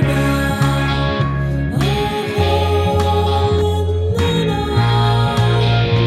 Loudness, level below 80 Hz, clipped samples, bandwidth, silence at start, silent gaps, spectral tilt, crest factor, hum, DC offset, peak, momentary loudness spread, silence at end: -16 LUFS; -28 dBFS; under 0.1%; 14 kHz; 0 s; none; -6.5 dB/octave; 12 dB; none; under 0.1%; -4 dBFS; 4 LU; 0 s